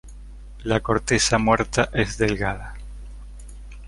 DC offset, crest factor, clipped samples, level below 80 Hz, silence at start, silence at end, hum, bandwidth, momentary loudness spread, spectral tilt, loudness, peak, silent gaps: under 0.1%; 22 dB; under 0.1%; -36 dBFS; 0.05 s; 0 s; 50 Hz at -35 dBFS; 11.5 kHz; 23 LU; -4 dB/octave; -21 LUFS; -2 dBFS; none